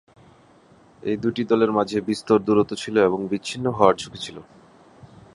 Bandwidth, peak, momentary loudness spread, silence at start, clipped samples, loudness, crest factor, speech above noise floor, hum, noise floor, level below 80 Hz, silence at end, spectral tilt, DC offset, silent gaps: 11.5 kHz; -2 dBFS; 12 LU; 1.05 s; under 0.1%; -22 LUFS; 22 dB; 32 dB; none; -53 dBFS; -58 dBFS; 0.95 s; -6 dB/octave; under 0.1%; none